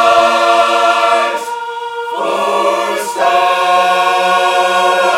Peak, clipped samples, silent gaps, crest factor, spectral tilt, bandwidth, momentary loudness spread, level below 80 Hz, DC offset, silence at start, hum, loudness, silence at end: 0 dBFS; under 0.1%; none; 10 dB; -1.5 dB/octave; 16.5 kHz; 10 LU; -60 dBFS; under 0.1%; 0 s; none; -12 LUFS; 0 s